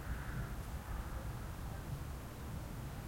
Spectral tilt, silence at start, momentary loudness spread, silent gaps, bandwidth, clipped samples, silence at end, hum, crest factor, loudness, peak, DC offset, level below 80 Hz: -6 dB/octave; 0 s; 3 LU; none; 16.5 kHz; under 0.1%; 0 s; none; 12 dB; -46 LUFS; -30 dBFS; under 0.1%; -46 dBFS